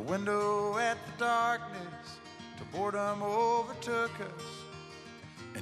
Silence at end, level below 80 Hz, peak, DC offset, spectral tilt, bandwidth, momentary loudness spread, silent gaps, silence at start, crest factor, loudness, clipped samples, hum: 0 s; -70 dBFS; -18 dBFS; under 0.1%; -4.5 dB/octave; 13 kHz; 18 LU; none; 0 s; 16 dB; -33 LUFS; under 0.1%; none